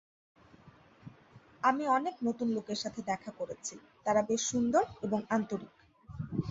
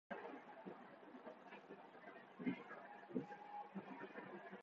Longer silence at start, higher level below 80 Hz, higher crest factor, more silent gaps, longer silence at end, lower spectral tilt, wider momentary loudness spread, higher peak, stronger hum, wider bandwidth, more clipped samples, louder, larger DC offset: first, 0.65 s vs 0.1 s; first, -64 dBFS vs under -90 dBFS; about the same, 20 dB vs 24 dB; neither; about the same, 0 s vs 0 s; about the same, -4.5 dB/octave vs -5 dB/octave; about the same, 13 LU vs 11 LU; first, -14 dBFS vs -30 dBFS; neither; first, 8 kHz vs 7 kHz; neither; first, -33 LUFS vs -54 LUFS; neither